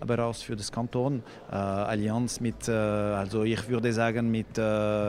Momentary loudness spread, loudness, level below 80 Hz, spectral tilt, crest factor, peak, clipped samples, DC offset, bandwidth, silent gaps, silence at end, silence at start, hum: 6 LU; -29 LUFS; -52 dBFS; -6 dB/octave; 18 dB; -10 dBFS; under 0.1%; under 0.1%; 14.5 kHz; none; 0 s; 0 s; none